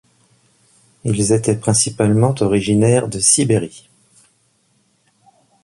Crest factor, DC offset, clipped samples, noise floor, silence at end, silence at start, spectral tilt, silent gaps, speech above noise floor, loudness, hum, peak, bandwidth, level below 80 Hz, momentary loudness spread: 18 dB; under 0.1%; under 0.1%; -61 dBFS; 1.85 s; 1.05 s; -5 dB/octave; none; 46 dB; -15 LUFS; none; 0 dBFS; 11.5 kHz; -46 dBFS; 7 LU